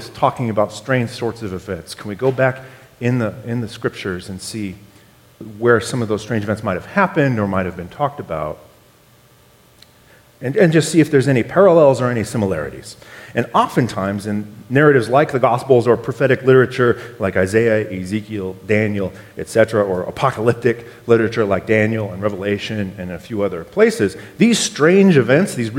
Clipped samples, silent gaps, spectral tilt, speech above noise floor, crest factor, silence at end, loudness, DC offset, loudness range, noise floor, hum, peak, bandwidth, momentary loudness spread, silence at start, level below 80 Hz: under 0.1%; none; -6 dB/octave; 33 dB; 18 dB; 0 s; -17 LUFS; under 0.1%; 7 LU; -50 dBFS; none; 0 dBFS; 16.5 kHz; 14 LU; 0 s; -52 dBFS